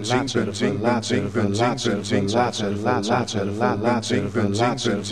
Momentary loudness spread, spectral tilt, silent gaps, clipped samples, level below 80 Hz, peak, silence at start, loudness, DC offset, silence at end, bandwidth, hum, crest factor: 3 LU; -5 dB/octave; none; under 0.1%; -54 dBFS; -4 dBFS; 0 s; -22 LUFS; 0.4%; 0 s; 12.5 kHz; none; 18 dB